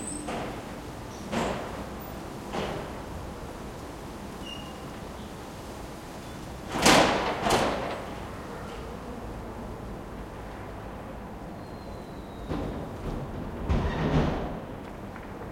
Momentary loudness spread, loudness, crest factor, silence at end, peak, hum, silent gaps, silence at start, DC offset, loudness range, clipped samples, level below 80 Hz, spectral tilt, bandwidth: 15 LU; -32 LUFS; 26 dB; 0 s; -4 dBFS; none; none; 0 s; under 0.1%; 13 LU; under 0.1%; -42 dBFS; -4.5 dB/octave; 16.5 kHz